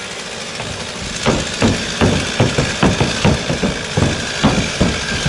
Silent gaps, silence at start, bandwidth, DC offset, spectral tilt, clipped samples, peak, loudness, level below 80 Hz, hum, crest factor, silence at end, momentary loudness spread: none; 0 s; 11.5 kHz; under 0.1%; -4.5 dB/octave; under 0.1%; -2 dBFS; -17 LUFS; -30 dBFS; none; 16 dB; 0 s; 9 LU